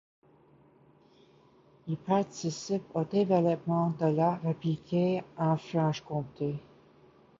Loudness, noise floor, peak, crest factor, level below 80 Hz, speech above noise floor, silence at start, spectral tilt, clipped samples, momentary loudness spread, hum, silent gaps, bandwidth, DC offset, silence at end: -30 LUFS; -61 dBFS; -14 dBFS; 18 dB; -70 dBFS; 32 dB; 1.85 s; -7.5 dB/octave; under 0.1%; 9 LU; none; none; 7.6 kHz; under 0.1%; 0.8 s